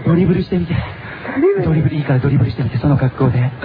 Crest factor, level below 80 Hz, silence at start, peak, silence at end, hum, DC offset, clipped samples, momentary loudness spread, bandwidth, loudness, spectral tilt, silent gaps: 14 dB; -36 dBFS; 0 s; 0 dBFS; 0 s; none; under 0.1%; under 0.1%; 8 LU; 5 kHz; -16 LUFS; -11.5 dB/octave; none